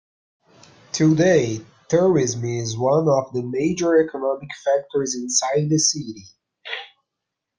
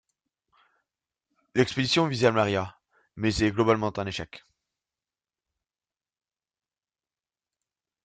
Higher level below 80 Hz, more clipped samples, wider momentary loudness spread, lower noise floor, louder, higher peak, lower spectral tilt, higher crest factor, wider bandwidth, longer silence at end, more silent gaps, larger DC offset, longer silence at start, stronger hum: about the same, -60 dBFS vs -56 dBFS; neither; first, 14 LU vs 11 LU; second, -82 dBFS vs under -90 dBFS; first, -20 LUFS vs -26 LUFS; about the same, -6 dBFS vs -6 dBFS; about the same, -4.5 dB/octave vs -5.5 dB/octave; second, 16 dB vs 24 dB; first, 10.5 kHz vs 9.4 kHz; second, 0.7 s vs 3.65 s; neither; neither; second, 0.95 s vs 1.55 s; neither